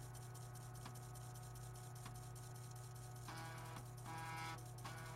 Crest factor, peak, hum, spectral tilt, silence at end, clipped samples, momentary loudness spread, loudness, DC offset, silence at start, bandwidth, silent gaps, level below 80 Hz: 16 dB; -38 dBFS; 50 Hz at -70 dBFS; -4.5 dB/octave; 0 s; under 0.1%; 5 LU; -53 LUFS; under 0.1%; 0 s; 16 kHz; none; -66 dBFS